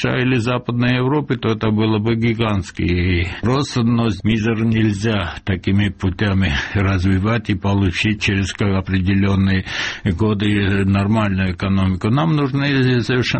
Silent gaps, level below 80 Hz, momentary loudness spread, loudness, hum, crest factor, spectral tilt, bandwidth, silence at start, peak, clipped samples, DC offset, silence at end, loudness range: none; -36 dBFS; 4 LU; -18 LUFS; none; 12 dB; -6.5 dB/octave; 8.6 kHz; 0 s; -4 dBFS; under 0.1%; under 0.1%; 0 s; 1 LU